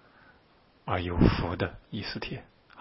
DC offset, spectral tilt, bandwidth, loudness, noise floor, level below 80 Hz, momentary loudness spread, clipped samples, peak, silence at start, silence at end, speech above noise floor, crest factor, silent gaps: under 0.1%; -10.5 dB/octave; 5.8 kHz; -30 LUFS; -62 dBFS; -40 dBFS; 15 LU; under 0.1%; -6 dBFS; 0.85 s; 0 s; 33 dB; 26 dB; none